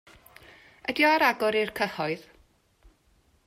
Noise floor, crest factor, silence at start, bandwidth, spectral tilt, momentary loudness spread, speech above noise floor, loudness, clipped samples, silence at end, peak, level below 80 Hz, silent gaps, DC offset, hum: -65 dBFS; 20 dB; 0.9 s; 16 kHz; -4 dB/octave; 13 LU; 40 dB; -25 LUFS; under 0.1%; 1.25 s; -10 dBFS; -64 dBFS; none; under 0.1%; none